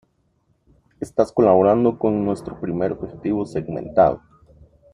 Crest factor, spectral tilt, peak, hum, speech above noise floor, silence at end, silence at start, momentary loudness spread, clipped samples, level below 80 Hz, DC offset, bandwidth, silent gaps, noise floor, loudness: 18 dB; -8.5 dB/octave; -2 dBFS; none; 46 dB; 0.75 s; 1 s; 13 LU; under 0.1%; -50 dBFS; under 0.1%; 11 kHz; none; -65 dBFS; -20 LUFS